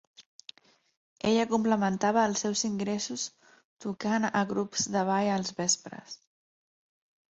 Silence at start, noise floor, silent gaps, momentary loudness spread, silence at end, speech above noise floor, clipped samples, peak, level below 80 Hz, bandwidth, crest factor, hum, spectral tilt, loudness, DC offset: 0.2 s; -54 dBFS; 0.26-0.39 s, 0.97-1.16 s, 3.65-3.77 s; 20 LU; 1.15 s; 25 dB; under 0.1%; -12 dBFS; -68 dBFS; 8.2 kHz; 18 dB; none; -3.5 dB/octave; -29 LUFS; under 0.1%